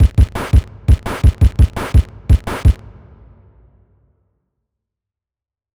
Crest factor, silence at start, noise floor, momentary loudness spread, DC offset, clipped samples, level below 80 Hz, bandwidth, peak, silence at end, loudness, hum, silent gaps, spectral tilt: 14 dB; 0 s; -89 dBFS; 3 LU; under 0.1%; under 0.1%; -18 dBFS; 12.5 kHz; -2 dBFS; 3 s; -16 LUFS; none; none; -7 dB/octave